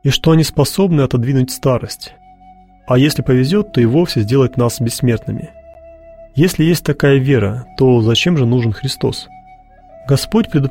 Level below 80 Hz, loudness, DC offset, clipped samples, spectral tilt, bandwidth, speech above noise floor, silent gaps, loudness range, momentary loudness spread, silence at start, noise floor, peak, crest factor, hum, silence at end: -38 dBFS; -14 LUFS; under 0.1%; under 0.1%; -6 dB/octave; 16.5 kHz; 30 dB; none; 2 LU; 9 LU; 0.05 s; -43 dBFS; 0 dBFS; 14 dB; none; 0 s